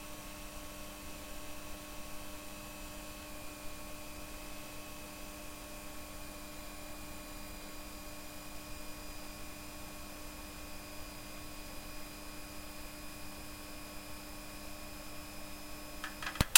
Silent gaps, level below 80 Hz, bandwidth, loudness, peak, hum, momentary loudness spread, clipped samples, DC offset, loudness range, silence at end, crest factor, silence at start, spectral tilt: none; -52 dBFS; 16.5 kHz; -46 LUFS; -2 dBFS; none; 1 LU; under 0.1%; under 0.1%; 0 LU; 0 s; 40 dB; 0 s; -2 dB/octave